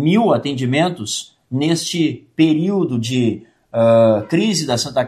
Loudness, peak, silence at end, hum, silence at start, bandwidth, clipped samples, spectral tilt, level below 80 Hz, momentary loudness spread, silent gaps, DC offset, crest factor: -17 LUFS; -2 dBFS; 0 s; none; 0 s; 14.5 kHz; under 0.1%; -5.5 dB/octave; -60 dBFS; 10 LU; none; under 0.1%; 14 dB